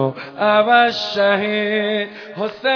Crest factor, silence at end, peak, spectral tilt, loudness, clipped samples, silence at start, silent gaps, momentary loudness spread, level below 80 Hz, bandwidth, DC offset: 18 dB; 0 s; 0 dBFS; -5.5 dB/octave; -17 LUFS; under 0.1%; 0 s; none; 12 LU; -68 dBFS; 5.4 kHz; under 0.1%